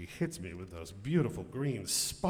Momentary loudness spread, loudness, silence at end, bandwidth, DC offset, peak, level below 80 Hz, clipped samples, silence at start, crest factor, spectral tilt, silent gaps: 12 LU; -35 LUFS; 0 s; 19 kHz; under 0.1%; -16 dBFS; -58 dBFS; under 0.1%; 0 s; 18 dB; -4.5 dB/octave; none